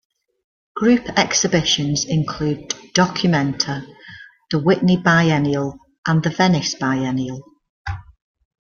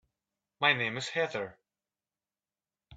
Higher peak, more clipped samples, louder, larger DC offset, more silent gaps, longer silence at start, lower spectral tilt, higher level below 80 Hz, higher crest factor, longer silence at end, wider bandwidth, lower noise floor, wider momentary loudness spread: first, 0 dBFS vs -12 dBFS; neither; first, -18 LUFS vs -30 LUFS; neither; first, 5.98-6.03 s, 7.69-7.85 s vs none; first, 0.75 s vs 0.6 s; about the same, -4.5 dB/octave vs -3.5 dB/octave; first, -48 dBFS vs -76 dBFS; about the same, 20 dB vs 24 dB; first, 0.65 s vs 0 s; second, 7.2 kHz vs 9 kHz; second, -42 dBFS vs under -90 dBFS; first, 16 LU vs 12 LU